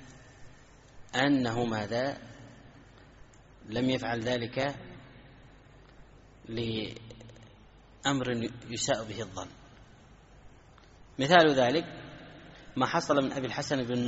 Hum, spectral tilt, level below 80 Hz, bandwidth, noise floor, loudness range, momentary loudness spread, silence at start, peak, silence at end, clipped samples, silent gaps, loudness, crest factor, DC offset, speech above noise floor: none; -3.5 dB/octave; -58 dBFS; 8 kHz; -56 dBFS; 9 LU; 24 LU; 0 s; -6 dBFS; 0 s; under 0.1%; none; -30 LUFS; 26 dB; under 0.1%; 27 dB